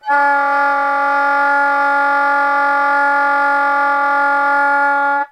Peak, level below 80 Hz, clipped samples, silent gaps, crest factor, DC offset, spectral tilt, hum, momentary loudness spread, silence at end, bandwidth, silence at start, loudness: -4 dBFS; -66 dBFS; under 0.1%; none; 10 dB; under 0.1%; -1.5 dB/octave; none; 1 LU; 0.05 s; 10.5 kHz; 0.05 s; -13 LUFS